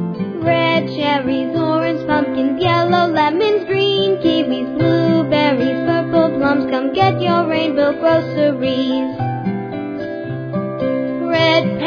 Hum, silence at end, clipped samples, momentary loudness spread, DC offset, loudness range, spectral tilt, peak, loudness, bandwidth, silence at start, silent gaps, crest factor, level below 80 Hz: none; 0 s; under 0.1%; 8 LU; under 0.1%; 3 LU; -7.5 dB/octave; 0 dBFS; -16 LUFS; 5.4 kHz; 0 s; none; 16 dB; -52 dBFS